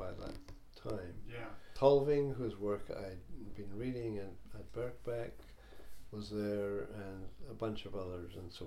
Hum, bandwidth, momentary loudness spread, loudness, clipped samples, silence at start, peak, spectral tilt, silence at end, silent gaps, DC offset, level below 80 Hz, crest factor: none; 14.5 kHz; 20 LU; -39 LUFS; under 0.1%; 0 s; -14 dBFS; -7.5 dB/octave; 0 s; none; under 0.1%; -56 dBFS; 24 dB